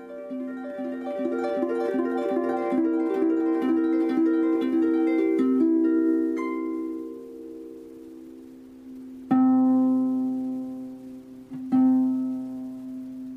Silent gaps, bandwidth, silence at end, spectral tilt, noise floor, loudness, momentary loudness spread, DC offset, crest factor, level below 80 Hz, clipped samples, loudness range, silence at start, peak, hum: none; 5.4 kHz; 0 s; -8 dB/octave; -45 dBFS; -24 LUFS; 21 LU; under 0.1%; 14 dB; -68 dBFS; under 0.1%; 5 LU; 0 s; -10 dBFS; none